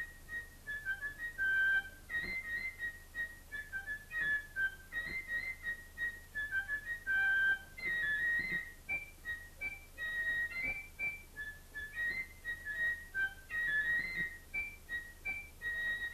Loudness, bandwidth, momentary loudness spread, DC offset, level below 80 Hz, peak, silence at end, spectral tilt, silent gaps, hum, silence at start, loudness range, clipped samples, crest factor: -37 LUFS; 14 kHz; 11 LU; under 0.1%; -56 dBFS; -26 dBFS; 0 s; -2.5 dB/octave; none; none; 0 s; 4 LU; under 0.1%; 14 dB